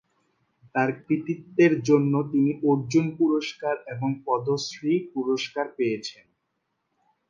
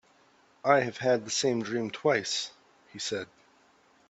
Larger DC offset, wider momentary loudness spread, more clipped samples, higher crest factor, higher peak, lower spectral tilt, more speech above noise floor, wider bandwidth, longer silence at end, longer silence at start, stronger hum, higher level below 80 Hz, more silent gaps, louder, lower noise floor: neither; second, 9 LU vs 13 LU; neither; second, 18 dB vs 24 dB; about the same, -8 dBFS vs -8 dBFS; first, -6.5 dB/octave vs -3.5 dB/octave; first, 53 dB vs 35 dB; second, 7.4 kHz vs 8.4 kHz; first, 1.15 s vs 0.85 s; about the same, 0.75 s vs 0.65 s; neither; about the same, -70 dBFS vs -74 dBFS; neither; first, -25 LUFS vs -29 LUFS; first, -77 dBFS vs -63 dBFS